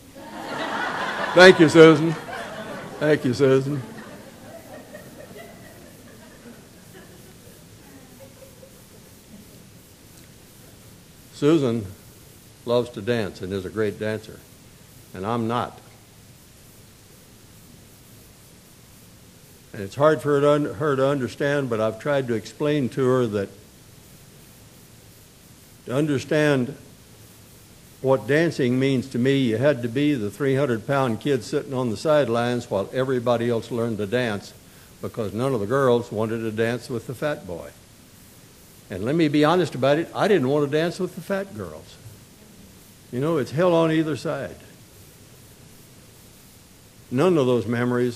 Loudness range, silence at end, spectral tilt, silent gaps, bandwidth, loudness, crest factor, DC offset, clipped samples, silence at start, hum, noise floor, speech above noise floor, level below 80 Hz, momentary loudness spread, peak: 10 LU; 0 s; -6 dB/octave; none; 15.5 kHz; -22 LUFS; 24 dB; under 0.1%; under 0.1%; 0.15 s; none; -49 dBFS; 28 dB; -58 dBFS; 20 LU; 0 dBFS